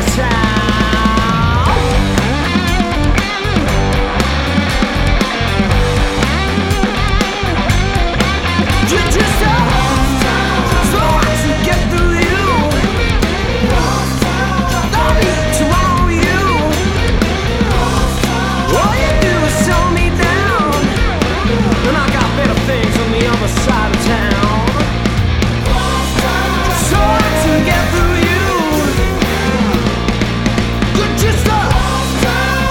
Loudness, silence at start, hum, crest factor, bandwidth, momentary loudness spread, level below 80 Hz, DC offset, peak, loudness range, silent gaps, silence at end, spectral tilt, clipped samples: -13 LUFS; 0 s; none; 12 dB; 17.5 kHz; 3 LU; -18 dBFS; 0.1%; 0 dBFS; 1 LU; none; 0 s; -5 dB/octave; under 0.1%